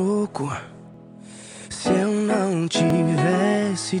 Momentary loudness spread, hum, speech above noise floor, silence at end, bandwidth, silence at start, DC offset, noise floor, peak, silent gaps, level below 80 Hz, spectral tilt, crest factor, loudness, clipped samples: 20 LU; none; 22 dB; 0 s; 11.5 kHz; 0 s; under 0.1%; -43 dBFS; -8 dBFS; none; -58 dBFS; -5.5 dB/octave; 14 dB; -22 LUFS; under 0.1%